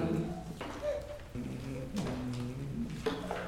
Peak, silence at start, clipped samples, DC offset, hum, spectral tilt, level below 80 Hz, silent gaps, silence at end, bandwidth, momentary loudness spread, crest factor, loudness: -20 dBFS; 0 s; under 0.1%; under 0.1%; none; -6.5 dB/octave; -50 dBFS; none; 0 s; 16.5 kHz; 5 LU; 18 dB; -39 LUFS